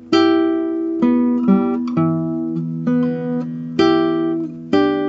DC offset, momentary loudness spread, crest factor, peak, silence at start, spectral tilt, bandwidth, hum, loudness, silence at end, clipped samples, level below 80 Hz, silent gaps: under 0.1%; 8 LU; 14 dB; -2 dBFS; 0 s; -7.5 dB/octave; 7.2 kHz; none; -18 LUFS; 0 s; under 0.1%; -62 dBFS; none